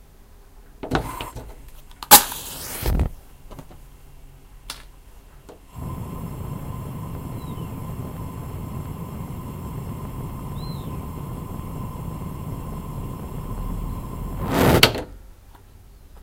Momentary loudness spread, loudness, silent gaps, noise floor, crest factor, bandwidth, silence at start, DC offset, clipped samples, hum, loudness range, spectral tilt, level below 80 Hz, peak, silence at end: 21 LU; -24 LUFS; none; -47 dBFS; 26 dB; 16 kHz; 0 s; under 0.1%; under 0.1%; none; 16 LU; -3 dB/octave; -36 dBFS; 0 dBFS; 0 s